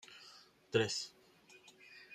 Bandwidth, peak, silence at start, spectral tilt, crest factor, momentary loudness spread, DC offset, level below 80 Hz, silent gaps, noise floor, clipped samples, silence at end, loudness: 14.5 kHz; -18 dBFS; 0.1 s; -3.5 dB/octave; 26 dB; 25 LU; under 0.1%; -80 dBFS; none; -64 dBFS; under 0.1%; 0 s; -37 LUFS